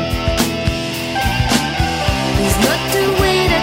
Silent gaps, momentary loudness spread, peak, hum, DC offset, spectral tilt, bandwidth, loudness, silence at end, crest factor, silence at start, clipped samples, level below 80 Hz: none; 5 LU; -2 dBFS; none; under 0.1%; -4.5 dB/octave; 16.5 kHz; -16 LUFS; 0 s; 14 dB; 0 s; under 0.1%; -26 dBFS